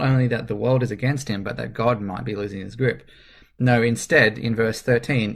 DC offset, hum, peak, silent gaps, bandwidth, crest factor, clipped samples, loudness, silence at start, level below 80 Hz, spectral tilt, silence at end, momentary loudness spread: under 0.1%; none; -2 dBFS; none; 13.5 kHz; 20 dB; under 0.1%; -22 LUFS; 0 s; -48 dBFS; -6 dB/octave; 0 s; 11 LU